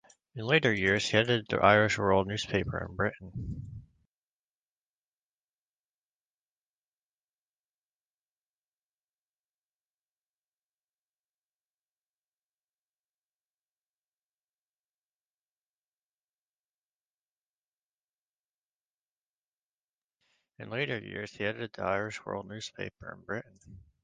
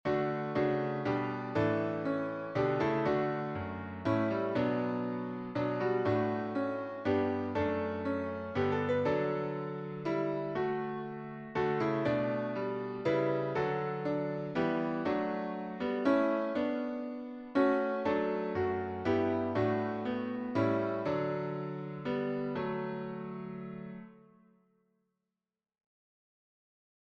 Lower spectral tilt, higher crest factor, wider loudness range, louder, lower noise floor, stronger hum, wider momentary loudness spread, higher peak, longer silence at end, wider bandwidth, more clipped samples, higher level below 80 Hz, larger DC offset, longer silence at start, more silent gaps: second, -5 dB/octave vs -8.5 dB/octave; first, 30 dB vs 16 dB; first, 15 LU vs 6 LU; first, -29 LUFS vs -33 LUFS; about the same, under -90 dBFS vs under -90 dBFS; first, 50 Hz at -65 dBFS vs none; first, 17 LU vs 8 LU; first, -6 dBFS vs -16 dBFS; second, 0.25 s vs 2.95 s; first, 9 kHz vs 7 kHz; neither; first, -58 dBFS vs -66 dBFS; neither; first, 0.35 s vs 0.05 s; first, 4.11-20.08 s vs none